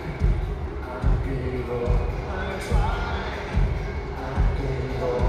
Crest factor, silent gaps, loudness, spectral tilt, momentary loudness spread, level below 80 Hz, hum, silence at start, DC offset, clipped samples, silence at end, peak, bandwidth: 16 dB; none; -27 LUFS; -7.5 dB/octave; 5 LU; -26 dBFS; none; 0 s; under 0.1%; under 0.1%; 0 s; -8 dBFS; 10 kHz